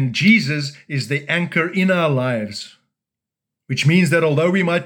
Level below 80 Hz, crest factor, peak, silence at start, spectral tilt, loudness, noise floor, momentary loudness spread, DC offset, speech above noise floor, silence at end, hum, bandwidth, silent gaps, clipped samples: -74 dBFS; 16 dB; -2 dBFS; 0 s; -6 dB/octave; -17 LUFS; -85 dBFS; 12 LU; under 0.1%; 68 dB; 0 s; none; 17 kHz; none; under 0.1%